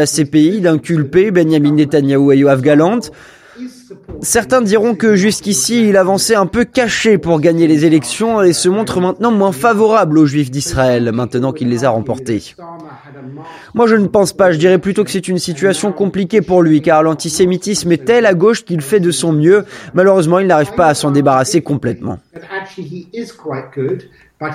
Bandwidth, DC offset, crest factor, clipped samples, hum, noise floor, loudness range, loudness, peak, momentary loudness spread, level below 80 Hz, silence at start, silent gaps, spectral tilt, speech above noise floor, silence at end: 15.5 kHz; under 0.1%; 12 dB; under 0.1%; none; -32 dBFS; 4 LU; -12 LUFS; 0 dBFS; 15 LU; -44 dBFS; 0 s; none; -5 dB/octave; 20 dB; 0 s